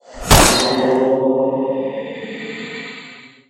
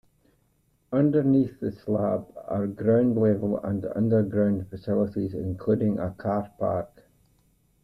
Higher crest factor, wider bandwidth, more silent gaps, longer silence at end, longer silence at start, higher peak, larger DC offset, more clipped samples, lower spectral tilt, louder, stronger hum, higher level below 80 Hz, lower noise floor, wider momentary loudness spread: about the same, 18 dB vs 16 dB; first, 16.5 kHz vs 5.2 kHz; neither; second, 0.25 s vs 0.95 s; second, 0.1 s vs 0.9 s; first, 0 dBFS vs -10 dBFS; neither; neither; second, -3.5 dB/octave vs -11 dB/octave; first, -15 LUFS vs -26 LUFS; neither; first, -30 dBFS vs -58 dBFS; second, -39 dBFS vs -67 dBFS; first, 18 LU vs 9 LU